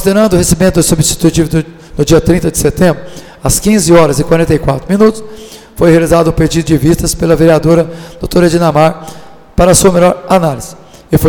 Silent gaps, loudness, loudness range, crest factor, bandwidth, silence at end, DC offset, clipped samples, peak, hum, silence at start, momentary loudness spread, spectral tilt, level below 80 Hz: none; -9 LUFS; 1 LU; 10 dB; 19.5 kHz; 0 s; under 0.1%; 0.2%; 0 dBFS; none; 0 s; 14 LU; -5.5 dB/octave; -26 dBFS